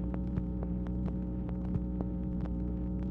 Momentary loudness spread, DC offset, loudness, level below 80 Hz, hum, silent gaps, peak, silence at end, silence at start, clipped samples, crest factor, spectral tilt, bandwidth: 1 LU; under 0.1%; -36 LUFS; -38 dBFS; 60 Hz at -40 dBFS; none; -18 dBFS; 0 s; 0 s; under 0.1%; 16 dB; -11.5 dB/octave; 3.5 kHz